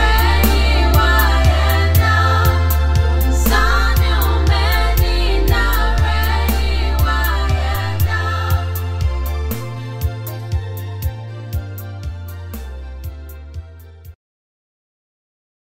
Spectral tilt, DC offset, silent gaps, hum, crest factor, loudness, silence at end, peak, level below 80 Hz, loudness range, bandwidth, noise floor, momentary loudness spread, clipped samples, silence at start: -5 dB/octave; under 0.1%; none; none; 16 dB; -16 LUFS; 1.55 s; 0 dBFS; -18 dBFS; 16 LU; 16.5 kHz; -37 dBFS; 17 LU; under 0.1%; 0 s